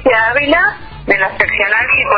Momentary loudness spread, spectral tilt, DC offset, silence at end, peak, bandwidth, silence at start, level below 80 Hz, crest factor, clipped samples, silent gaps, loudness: 5 LU; -7 dB/octave; under 0.1%; 0 s; 0 dBFS; 6 kHz; 0 s; -38 dBFS; 12 dB; under 0.1%; none; -12 LUFS